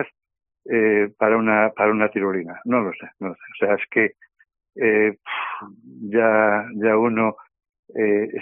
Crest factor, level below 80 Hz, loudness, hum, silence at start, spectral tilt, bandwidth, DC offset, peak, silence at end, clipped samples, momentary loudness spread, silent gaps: 18 dB; -66 dBFS; -20 LUFS; none; 0 s; -0.5 dB/octave; 3.6 kHz; under 0.1%; -2 dBFS; 0 s; under 0.1%; 14 LU; 7.79-7.83 s